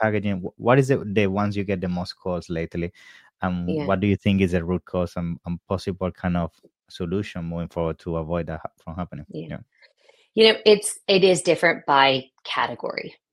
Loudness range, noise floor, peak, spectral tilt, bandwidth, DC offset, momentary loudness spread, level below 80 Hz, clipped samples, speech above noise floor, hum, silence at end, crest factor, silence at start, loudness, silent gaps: 10 LU; -59 dBFS; -2 dBFS; -5 dB/octave; 12.5 kHz; under 0.1%; 16 LU; -50 dBFS; under 0.1%; 36 dB; none; 0.2 s; 22 dB; 0 s; -23 LUFS; none